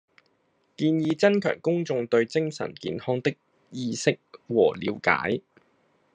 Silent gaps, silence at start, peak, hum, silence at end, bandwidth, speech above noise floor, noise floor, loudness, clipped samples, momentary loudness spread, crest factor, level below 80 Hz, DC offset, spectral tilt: none; 0.8 s; -4 dBFS; none; 0.75 s; 10 kHz; 44 dB; -69 dBFS; -26 LUFS; under 0.1%; 10 LU; 24 dB; -72 dBFS; under 0.1%; -5.5 dB/octave